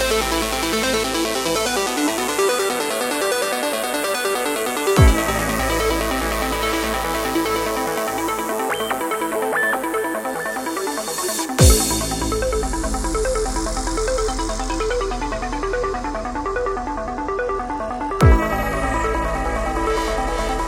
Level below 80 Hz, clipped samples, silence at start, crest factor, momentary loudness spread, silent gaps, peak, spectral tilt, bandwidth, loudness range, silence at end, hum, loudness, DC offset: -28 dBFS; under 0.1%; 0 s; 20 dB; 8 LU; none; 0 dBFS; -4 dB/octave; 16.5 kHz; 4 LU; 0 s; none; -20 LUFS; under 0.1%